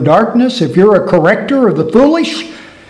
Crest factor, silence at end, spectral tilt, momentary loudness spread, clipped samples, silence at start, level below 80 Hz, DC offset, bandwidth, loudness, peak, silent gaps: 10 dB; 0.25 s; -6.5 dB/octave; 8 LU; 0.7%; 0 s; -44 dBFS; under 0.1%; 11 kHz; -10 LUFS; 0 dBFS; none